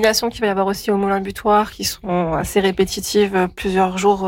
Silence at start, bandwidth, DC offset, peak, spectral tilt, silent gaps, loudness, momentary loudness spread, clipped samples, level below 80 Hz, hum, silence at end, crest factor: 0 s; 17 kHz; under 0.1%; -4 dBFS; -4.5 dB/octave; none; -18 LUFS; 4 LU; under 0.1%; -42 dBFS; none; 0 s; 14 dB